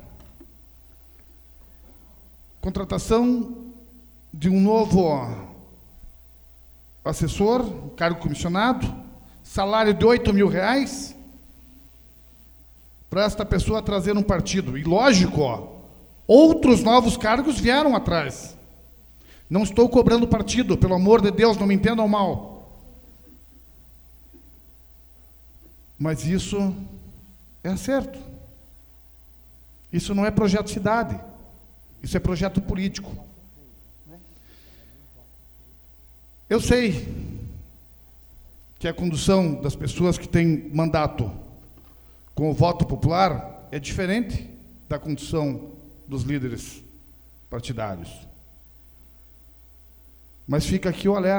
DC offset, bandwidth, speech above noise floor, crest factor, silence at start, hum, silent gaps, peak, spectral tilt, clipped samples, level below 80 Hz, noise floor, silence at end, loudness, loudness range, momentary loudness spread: under 0.1%; over 20 kHz; 29 dB; 22 dB; 0 s; none; none; 0 dBFS; -6 dB/octave; under 0.1%; -40 dBFS; -50 dBFS; 0 s; -22 LUFS; 13 LU; 19 LU